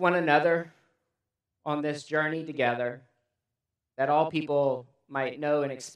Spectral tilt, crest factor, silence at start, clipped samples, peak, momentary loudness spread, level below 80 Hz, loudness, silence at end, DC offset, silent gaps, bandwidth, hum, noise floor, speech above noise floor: -5.5 dB/octave; 22 dB; 0 s; under 0.1%; -6 dBFS; 13 LU; -80 dBFS; -28 LUFS; 0 s; under 0.1%; none; 11.5 kHz; none; -87 dBFS; 60 dB